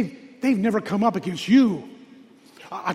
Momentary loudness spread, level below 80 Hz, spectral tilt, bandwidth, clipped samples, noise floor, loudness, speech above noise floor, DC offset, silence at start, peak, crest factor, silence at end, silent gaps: 13 LU; -64 dBFS; -6.5 dB/octave; 12.5 kHz; under 0.1%; -49 dBFS; -22 LUFS; 29 dB; under 0.1%; 0 s; -6 dBFS; 16 dB; 0 s; none